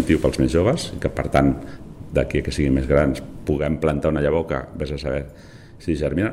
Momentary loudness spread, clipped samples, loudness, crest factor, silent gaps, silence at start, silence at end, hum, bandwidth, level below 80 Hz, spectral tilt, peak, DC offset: 10 LU; under 0.1%; -22 LUFS; 18 dB; none; 0 s; 0 s; none; 14 kHz; -32 dBFS; -7 dB/octave; -4 dBFS; under 0.1%